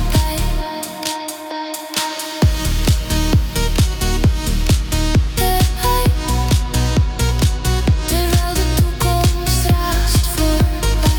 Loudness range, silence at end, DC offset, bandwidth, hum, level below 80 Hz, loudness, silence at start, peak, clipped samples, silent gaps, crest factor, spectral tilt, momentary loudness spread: 3 LU; 0 s; under 0.1%; 19 kHz; none; -18 dBFS; -17 LUFS; 0 s; -2 dBFS; under 0.1%; none; 14 dB; -4.5 dB/octave; 6 LU